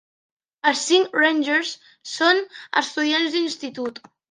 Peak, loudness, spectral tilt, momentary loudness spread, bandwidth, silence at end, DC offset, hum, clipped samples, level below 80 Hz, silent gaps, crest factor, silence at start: -4 dBFS; -21 LUFS; -1 dB/octave; 13 LU; 10 kHz; 0.3 s; under 0.1%; none; under 0.1%; -80 dBFS; none; 18 dB; 0.65 s